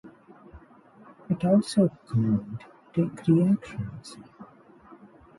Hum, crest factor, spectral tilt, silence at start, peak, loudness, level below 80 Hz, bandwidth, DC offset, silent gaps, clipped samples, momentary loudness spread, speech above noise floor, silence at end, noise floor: none; 18 dB; -8 dB/octave; 0.05 s; -10 dBFS; -26 LUFS; -58 dBFS; 11.5 kHz; under 0.1%; none; under 0.1%; 20 LU; 28 dB; 0.95 s; -53 dBFS